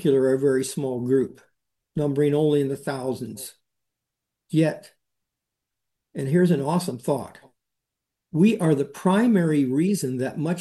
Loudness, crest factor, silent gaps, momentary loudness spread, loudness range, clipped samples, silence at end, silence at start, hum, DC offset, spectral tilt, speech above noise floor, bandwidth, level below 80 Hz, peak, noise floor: -23 LUFS; 16 dB; none; 12 LU; 6 LU; under 0.1%; 0 s; 0 s; none; under 0.1%; -7 dB/octave; 62 dB; 12.5 kHz; -68 dBFS; -8 dBFS; -84 dBFS